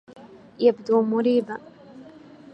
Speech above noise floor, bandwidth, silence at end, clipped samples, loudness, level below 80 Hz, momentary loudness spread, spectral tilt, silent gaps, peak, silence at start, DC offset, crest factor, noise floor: 25 dB; 6.6 kHz; 0.5 s; under 0.1%; -22 LUFS; -74 dBFS; 13 LU; -7.5 dB/octave; none; -6 dBFS; 0.25 s; under 0.1%; 18 dB; -46 dBFS